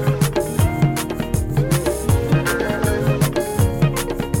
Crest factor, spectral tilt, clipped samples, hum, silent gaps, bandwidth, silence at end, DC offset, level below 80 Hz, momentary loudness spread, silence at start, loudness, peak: 12 dB; -6 dB/octave; under 0.1%; none; none; 17 kHz; 0 s; under 0.1%; -30 dBFS; 5 LU; 0 s; -19 LUFS; -6 dBFS